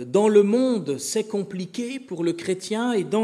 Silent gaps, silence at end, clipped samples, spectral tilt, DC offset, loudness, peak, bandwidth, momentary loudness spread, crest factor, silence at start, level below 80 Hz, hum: none; 0 s; under 0.1%; -5 dB/octave; under 0.1%; -23 LUFS; -6 dBFS; 13.5 kHz; 13 LU; 16 dB; 0 s; -76 dBFS; none